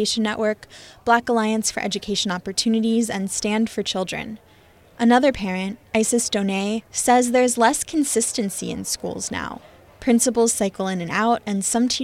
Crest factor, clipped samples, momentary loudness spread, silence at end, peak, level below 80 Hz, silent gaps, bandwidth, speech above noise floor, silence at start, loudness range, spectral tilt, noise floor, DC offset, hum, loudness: 18 dB; under 0.1%; 10 LU; 0 s; -4 dBFS; -52 dBFS; none; 15.5 kHz; 30 dB; 0 s; 3 LU; -3.5 dB/octave; -52 dBFS; under 0.1%; none; -21 LUFS